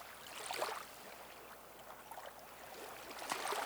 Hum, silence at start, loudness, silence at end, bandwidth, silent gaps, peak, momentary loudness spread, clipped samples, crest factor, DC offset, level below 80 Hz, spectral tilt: none; 0 s; -47 LUFS; 0 s; over 20 kHz; none; -22 dBFS; 12 LU; under 0.1%; 24 dB; under 0.1%; -76 dBFS; -1 dB/octave